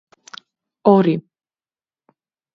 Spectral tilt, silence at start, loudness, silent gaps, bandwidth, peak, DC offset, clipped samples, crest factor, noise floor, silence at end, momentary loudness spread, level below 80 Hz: -8.5 dB/octave; 0.85 s; -17 LUFS; none; 7 kHz; 0 dBFS; under 0.1%; under 0.1%; 22 dB; under -90 dBFS; 1.35 s; 25 LU; -66 dBFS